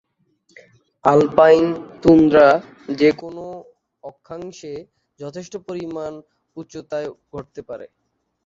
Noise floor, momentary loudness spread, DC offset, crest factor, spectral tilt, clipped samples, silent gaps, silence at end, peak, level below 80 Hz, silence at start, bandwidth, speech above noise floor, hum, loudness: -63 dBFS; 23 LU; under 0.1%; 20 dB; -7 dB/octave; under 0.1%; none; 0.6 s; 0 dBFS; -52 dBFS; 1.05 s; 7.6 kHz; 45 dB; none; -16 LUFS